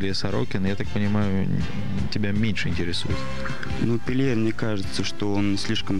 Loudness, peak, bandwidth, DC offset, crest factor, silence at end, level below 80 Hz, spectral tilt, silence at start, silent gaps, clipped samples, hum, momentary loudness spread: -26 LUFS; -10 dBFS; 12 kHz; 6%; 16 dB; 0 s; -42 dBFS; -6 dB/octave; 0 s; none; under 0.1%; none; 5 LU